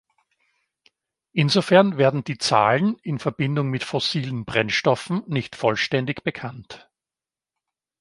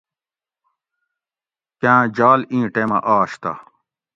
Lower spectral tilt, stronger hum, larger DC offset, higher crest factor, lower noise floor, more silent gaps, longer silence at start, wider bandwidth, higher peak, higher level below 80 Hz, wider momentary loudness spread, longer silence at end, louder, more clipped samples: second, -5.5 dB/octave vs -7.5 dB/octave; neither; neither; about the same, 22 dB vs 20 dB; about the same, under -90 dBFS vs under -90 dBFS; neither; second, 1.35 s vs 1.85 s; first, 11.5 kHz vs 7.8 kHz; about the same, -2 dBFS vs 0 dBFS; about the same, -60 dBFS vs -62 dBFS; about the same, 11 LU vs 13 LU; first, 1.2 s vs 0.55 s; second, -22 LUFS vs -17 LUFS; neither